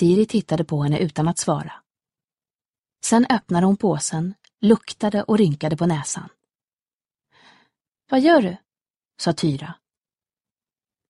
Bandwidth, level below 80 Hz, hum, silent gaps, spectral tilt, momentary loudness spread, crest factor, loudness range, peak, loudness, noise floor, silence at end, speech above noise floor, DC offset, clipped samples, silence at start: 11.5 kHz; -58 dBFS; none; 2.55-2.59 s, 2.65-2.73 s, 2.80-2.84 s, 6.55-6.77 s, 6.93-6.99 s, 8.90-9.00 s; -5.5 dB/octave; 11 LU; 20 dB; 4 LU; -2 dBFS; -21 LUFS; under -90 dBFS; 1.35 s; over 71 dB; under 0.1%; under 0.1%; 0 s